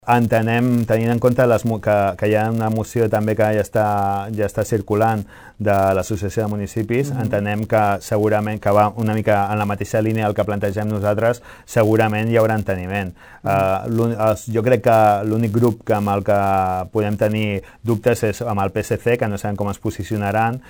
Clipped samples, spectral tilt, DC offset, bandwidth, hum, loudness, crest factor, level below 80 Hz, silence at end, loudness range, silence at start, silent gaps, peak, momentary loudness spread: under 0.1%; -7 dB/octave; under 0.1%; over 20 kHz; none; -19 LUFS; 16 dB; -48 dBFS; 0.1 s; 3 LU; 0.05 s; none; -2 dBFS; 7 LU